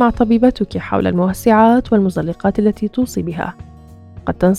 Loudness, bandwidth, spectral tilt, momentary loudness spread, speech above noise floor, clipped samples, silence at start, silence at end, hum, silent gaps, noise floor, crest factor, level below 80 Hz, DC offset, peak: -15 LUFS; 14.5 kHz; -7.5 dB/octave; 12 LU; 24 dB; under 0.1%; 0 s; 0 s; none; none; -38 dBFS; 16 dB; -36 dBFS; under 0.1%; 0 dBFS